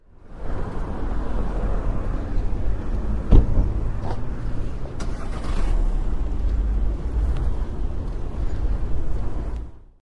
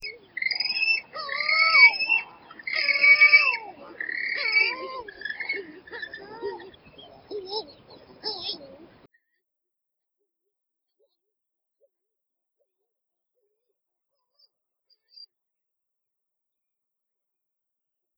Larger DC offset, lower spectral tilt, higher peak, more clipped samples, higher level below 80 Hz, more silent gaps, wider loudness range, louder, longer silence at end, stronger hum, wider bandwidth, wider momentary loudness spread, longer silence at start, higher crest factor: neither; first, -8 dB/octave vs -3 dB/octave; about the same, -2 dBFS vs -4 dBFS; neither; first, -24 dBFS vs -72 dBFS; neither; second, 3 LU vs 20 LU; second, -28 LUFS vs -20 LUFS; second, 0.2 s vs 9.4 s; neither; first, 6.4 kHz vs 5.8 kHz; second, 7 LU vs 24 LU; first, 0.25 s vs 0 s; about the same, 20 dB vs 24 dB